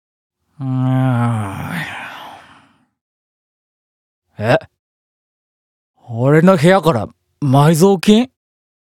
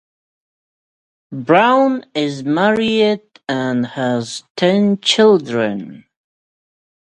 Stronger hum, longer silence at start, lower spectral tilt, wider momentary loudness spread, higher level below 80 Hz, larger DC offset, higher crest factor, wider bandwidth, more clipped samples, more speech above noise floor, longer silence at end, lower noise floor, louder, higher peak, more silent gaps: neither; second, 0.6 s vs 1.3 s; first, -6.5 dB/octave vs -5 dB/octave; first, 18 LU vs 13 LU; first, -52 dBFS vs -62 dBFS; neither; about the same, 16 dB vs 18 dB; first, 16.5 kHz vs 11 kHz; neither; second, 39 dB vs over 75 dB; second, 0.65 s vs 1 s; second, -51 dBFS vs under -90 dBFS; about the same, -14 LUFS vs -15 LUFS; about the same, 0 dBFS vs 0 dBFS; first, 3.01-4.22 s, 4.79-5.94 s vs 4.50-4.55 s